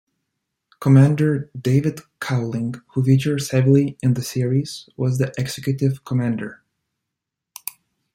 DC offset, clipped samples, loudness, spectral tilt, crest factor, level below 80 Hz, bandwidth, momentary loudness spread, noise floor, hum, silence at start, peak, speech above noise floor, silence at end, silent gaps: under 0.1%; under 0.1%; -20 LUFS; -7 dB/octave; 18 dB; -58 dBFS; 15.5 kHz; 14 LU; -83 dBFS; none; 0.8 s; -4 dBFS; 64 dB; 1.6 s; none